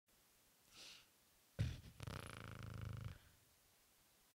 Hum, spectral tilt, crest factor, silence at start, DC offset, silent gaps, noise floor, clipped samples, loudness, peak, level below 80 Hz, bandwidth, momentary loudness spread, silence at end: none; -5.5 dB/octave; 22 dB; 0.1 s; under 0.1%; none; -74 dBFS; under 0.1%; -52 LUFS; -30 dBFS; -62 dBFS; 16 kHz; 16 LU; 0.1 s